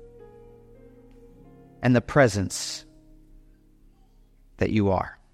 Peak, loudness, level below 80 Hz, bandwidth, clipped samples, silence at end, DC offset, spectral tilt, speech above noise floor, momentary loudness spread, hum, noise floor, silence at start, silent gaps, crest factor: -6 dBFS; -24 LUFS; -50 dBFS; 15.5 kHz; under 0.1%; 0.2 s; under 0.1%; -5.5 dB/octave; 34 dB; 10 LU; none; -56 dBFS; 0 s; none; 22 dB